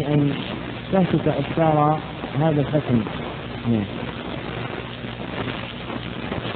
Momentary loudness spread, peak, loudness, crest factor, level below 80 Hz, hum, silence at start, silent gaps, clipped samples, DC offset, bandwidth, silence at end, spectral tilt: 11 LU; -6 dBFS; -24 LUFS; 18 dB; -44 dBFS; none; 0 s; none; under 0.1%; under 0.1%; 4.5 kHz; 0 s; -11 dB/octave